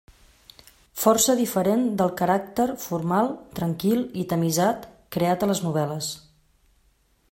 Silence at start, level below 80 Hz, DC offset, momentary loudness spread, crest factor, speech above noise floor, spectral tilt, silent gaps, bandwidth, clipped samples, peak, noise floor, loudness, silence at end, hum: 0.95 s; -58 dBFS; under 0.1%; 10 LU; 20 dB; 41 dB; -5 dB/octave; none; 16.5 kHz; under 0.1%; -4 dBFS; -64 dBFS; -24 LUFS; 1.1 s; none